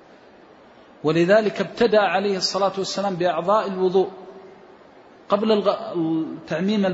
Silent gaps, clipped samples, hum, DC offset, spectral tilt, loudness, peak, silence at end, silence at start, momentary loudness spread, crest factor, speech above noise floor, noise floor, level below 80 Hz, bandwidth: none; under 0.1%; none; under 0.1%; -5.5 dB/octave; -21 LUFS; -4 dBFS; 0 s; 1.05 s; 9 LU; 18 dB; 28 dB; -48 dBFS; -64 dBFS; 8 kHz